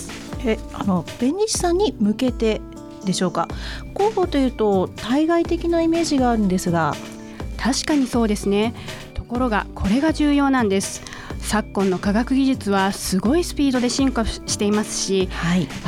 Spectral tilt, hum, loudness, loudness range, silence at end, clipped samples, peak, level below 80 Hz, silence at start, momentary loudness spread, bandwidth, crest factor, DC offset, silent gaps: -5 dB/octave; none; -21 LUFS; 2 LU; 0 s; under 0.1%; -6 dBFS; -36 dBFS; 0 s; 10 LU; 16 kHz; 14 dB; under 0.1%; none